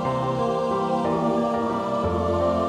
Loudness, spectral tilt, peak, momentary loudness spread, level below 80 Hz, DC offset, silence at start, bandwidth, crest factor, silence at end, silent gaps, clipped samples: -24 LUFS; -7.5 dB/octave; -12 dBFS; 2 LU; -44 dBFS; under 0.1%; 0 s; 11.5 kHz; 12 dB; 0 s; none; under 0.1%